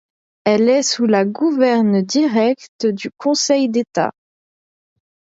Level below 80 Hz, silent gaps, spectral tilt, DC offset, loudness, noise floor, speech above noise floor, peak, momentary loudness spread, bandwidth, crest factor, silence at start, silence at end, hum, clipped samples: -68 dBFS; 2.69-2.79 s; -4.5 dB/octave; under 0.1%; -17 LUFS; under -90 dBFS; over 74 dB; -2 dBFS; 7 LU; 8 kHz; 14 dB; 0.45 s; 1.15 s; none; under 0.1%